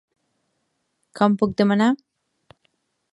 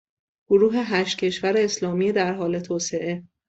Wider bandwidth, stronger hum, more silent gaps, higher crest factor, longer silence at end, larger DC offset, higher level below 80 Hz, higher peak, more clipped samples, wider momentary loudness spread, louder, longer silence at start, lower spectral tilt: first, 11 kHz vs 8.2 kHz; neither; neither; first, 22 dB vs 16 dB; first, 1.15 s vs 0.25 s; neither; about the same, -60 dBFS vs -64 dBFS; first, -2 dBFS vs -6 dBFS; neither; second, 4 LU vs 7 LU; first, -20 LUFS vs -23 LUFS; first, 1.15 s vs 0.5 s; first, -7 dB/octave vs -4.5 dB/octave